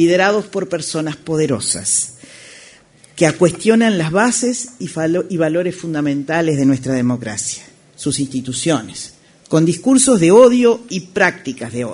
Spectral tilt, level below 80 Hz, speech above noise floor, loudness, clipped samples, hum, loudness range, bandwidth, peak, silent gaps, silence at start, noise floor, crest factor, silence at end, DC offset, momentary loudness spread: -4.5 dB/octave; -54 dBFS; 31 dB; -16 LUFS; under 0.1%; none; 5 LU; 11 kHz; 0 dBFS; none; 0 s; -46 dBFS; 16 dB; 0 s; under 0.1%; 13 LU